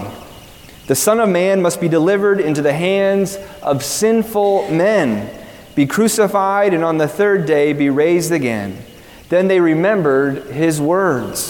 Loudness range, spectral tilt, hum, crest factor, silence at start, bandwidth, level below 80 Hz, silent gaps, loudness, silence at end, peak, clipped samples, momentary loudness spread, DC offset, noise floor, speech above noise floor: 1 LU; -5 dB/octave; none; 14 dB; 0 s; 18 kHz; -50 dBFS; none; -15 LUFS; 0 s; -2 dBFS; under 0.1%; 8 LU; under 0.1%; -39 dBFS; 24 dB